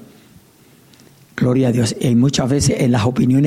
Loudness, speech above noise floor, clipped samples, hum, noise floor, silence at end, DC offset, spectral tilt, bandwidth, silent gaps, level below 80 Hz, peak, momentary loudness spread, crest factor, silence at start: -16 LUFS; 34 dB; under 0.1%; none; -49 dBFS; 0 s; under 0.1%; -6 dB/octave; 15 kHz; none; -44 dBFS; -6 dBFS; 3 LU; 10 dB; 1.35 s